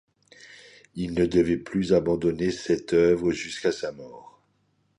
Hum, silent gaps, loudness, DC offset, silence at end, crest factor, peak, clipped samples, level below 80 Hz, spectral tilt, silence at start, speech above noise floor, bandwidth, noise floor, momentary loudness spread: none; none; -25 LUFS; under 0.1%; 0.7 s; 18 dB; -8 dBFS; under 0.1%; -50 dBFS; -6 dB/octave; 0.45 s; 45 dB; 11 kHz; -69 dBFS; 13 LU